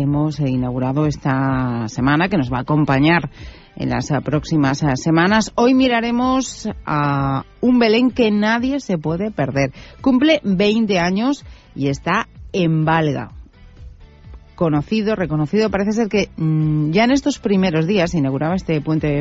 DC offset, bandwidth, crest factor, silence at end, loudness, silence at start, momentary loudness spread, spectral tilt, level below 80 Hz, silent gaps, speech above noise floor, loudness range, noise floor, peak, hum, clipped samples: under 0.1%; 8 kHz; 14 dB; 0 s; -18 LUFS; 0 s; 7 LU; -6.5 dB/octave; -40 dBFS; none; 23 dB; 4 LU; -40 dBFS; -4 dBFS; none; under 0.1%